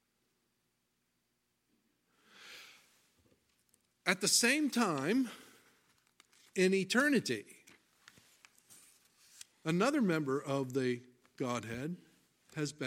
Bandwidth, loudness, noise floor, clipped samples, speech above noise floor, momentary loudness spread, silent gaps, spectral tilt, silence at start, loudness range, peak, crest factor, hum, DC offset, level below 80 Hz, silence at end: 16.5 kHz; -33 LUFS; -81 dBFS; under 0.1%; 48 dB; 22 LU; none; -3.5 dB/octave; 2.4 s; 5 LU; -14 dBFS; 24 dB; 60 Hz at -65 dBFS; under 0.1%; -80 dBFS; 0 s